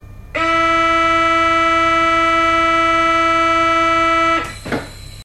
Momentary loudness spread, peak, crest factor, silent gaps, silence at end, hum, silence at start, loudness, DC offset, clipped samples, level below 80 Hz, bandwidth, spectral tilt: 11 LU; -4 dBFS; 10 dB; none; 0 s; none; 0.05 s; -13 LUFS; 0.2%; under 0.1%; -36 dBFS; 13.5 kHz; -3.5 dB/octave